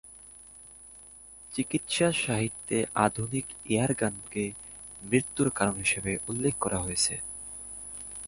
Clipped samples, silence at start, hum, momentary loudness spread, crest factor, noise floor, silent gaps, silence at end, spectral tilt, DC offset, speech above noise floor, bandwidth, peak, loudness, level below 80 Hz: under 0.1%; 0.05 s; 50 Hz at -55 dBFS; 21 LU; 24 dB; -50 dBFS; none; 0 s; -4 dB/octave; under 0.1%; 21 dB; 11.5 kHz; -8 dBFS; -29 LUFS; -54 dBFS